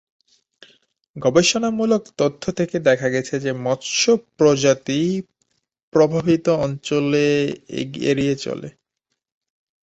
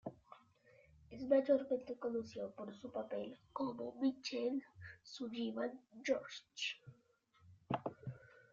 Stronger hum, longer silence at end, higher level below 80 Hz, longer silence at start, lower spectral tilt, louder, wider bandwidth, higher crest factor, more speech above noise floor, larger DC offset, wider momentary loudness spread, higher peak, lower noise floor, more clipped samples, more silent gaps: neither; first, 1.2 s vs 0.25 s; first, -56 dBFS vs -78 dBFS; first, 1.15 s vs 0.05 s; about the same, -4.5 dB/octave vs -4 dB/octave; first, -19 LUFS vs -41 LUFS; about the same, 8.2 kHz vs 7.6 kHz; about the same, 18 dB vs 22 dB; first, 59 dB vs 32 dB; neither; second, 9 LU vs 17 LU; first, -2 dBFS vs -22 dBFS; first, -78 dBFS vs -73 dBFS; neither; first, 5.83-5.92 s vs none